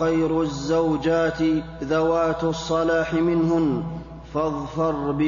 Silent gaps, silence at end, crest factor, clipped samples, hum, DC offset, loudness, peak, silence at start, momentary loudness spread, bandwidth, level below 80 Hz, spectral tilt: none; 0 s; 12 dB; under 0.1%; none; under 0.1%; -23 LUFS; -10 dBFS; 0 s; 6 LU; 7.4 kHz; -44 dBFS; -6.5 dB/octave